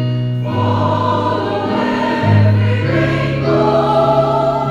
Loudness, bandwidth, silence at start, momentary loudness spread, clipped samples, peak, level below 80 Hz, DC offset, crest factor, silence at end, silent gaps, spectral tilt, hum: -15 LUFS; 7.6 kHz; 0 s; 5 LU; under 0.1%; 0 dBFS; -40 dBFS; under 0.1%; 14 dB; 0 s; none; -8 dB/octave; none